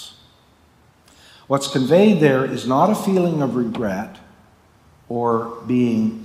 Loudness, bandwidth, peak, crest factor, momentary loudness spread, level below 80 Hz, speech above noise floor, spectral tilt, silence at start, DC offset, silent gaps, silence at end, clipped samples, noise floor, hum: -19 LUFS; 16 kHz; -2 dBFS; 18 dB; 11 LU; -60 dBFS; 36 dB; -6.5 dB/octave; 0 s; under 0.1%; none; 0 s; under 0.1%; -54 dBFS; none